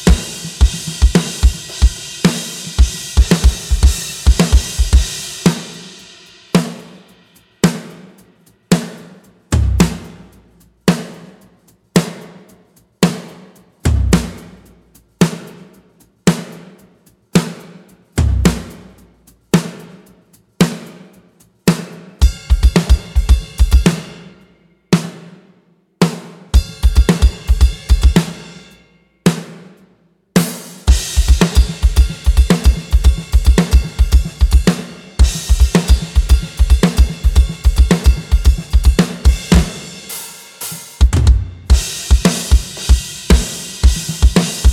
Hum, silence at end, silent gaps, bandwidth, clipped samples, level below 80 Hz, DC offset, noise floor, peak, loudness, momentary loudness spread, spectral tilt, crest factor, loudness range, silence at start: none; 0 s; none; 15.5 kHz; under 0.1%; -16 dBFS; under 0.1%; -54 dBFS; 0 dBFS; -15 LUFS; 14 LU; -5.5 dB/octave; 14 dB; 7 LU; 0 s